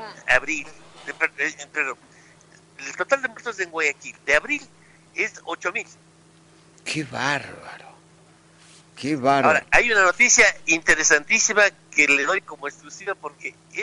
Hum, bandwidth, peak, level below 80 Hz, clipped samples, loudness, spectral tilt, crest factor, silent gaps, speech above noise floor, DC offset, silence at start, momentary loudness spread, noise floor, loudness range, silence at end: none; 11 kHz; -4 dBFS; -50 dBFS; under 0.1%; -20 LUFS; -1.5 dB/octave; 20 dB; none; 31 dB; under 0.1%; 0 s; 19 LU; -53 dBFS; 12 LU; 0 s